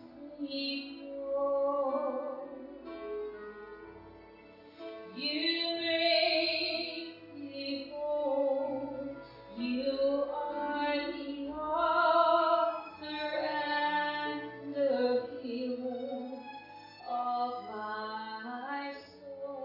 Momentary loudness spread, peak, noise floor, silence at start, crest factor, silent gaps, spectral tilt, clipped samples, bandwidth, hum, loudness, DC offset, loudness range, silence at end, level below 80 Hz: 19 LU; -14 dBFS; -54 dBFS; 0 s; 20 dB; none; -5.5 dB/octave; under 0.1%; 5.8 kHz; none; -33 LUFS; under 0.1%; 8 LU; 0 s; -70 dBFS